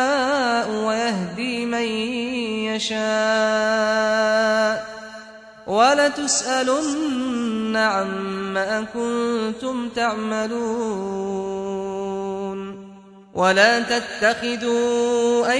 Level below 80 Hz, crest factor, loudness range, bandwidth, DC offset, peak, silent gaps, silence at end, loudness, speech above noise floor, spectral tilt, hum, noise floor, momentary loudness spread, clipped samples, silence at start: -58 dBFS; 20 dB; 5 LU; 10.5 kHz; under 0.1%; -2 dBFS; none; 0 s; -21 LUFS; 23 dB; -3 dB/octave; none; -44 dBFS; 9 LU; under 0.1%; 0 s